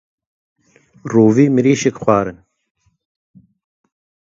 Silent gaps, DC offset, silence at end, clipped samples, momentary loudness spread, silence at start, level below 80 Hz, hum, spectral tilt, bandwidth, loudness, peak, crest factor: none; under 0.1%; 2 s; under 0.1%; 11 LU; 1.05 s; -54 dBFS; none; -6.5 dB/octave; 7.8 kHz; -14 LUFS; 0 dBFS; 18 dB